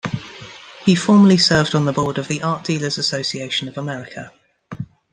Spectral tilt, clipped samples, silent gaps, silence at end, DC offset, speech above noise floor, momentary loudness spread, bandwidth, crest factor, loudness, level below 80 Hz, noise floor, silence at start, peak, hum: -5 dB/octave; under 0.1%; none; 0.3 s; under 0.1%; 21 dB; 23 LU; 9.8 kHz; 16 dB; -17 LUFS; -52 dBFS; -38 dBFS; 0.05 s; -2 dBFS; none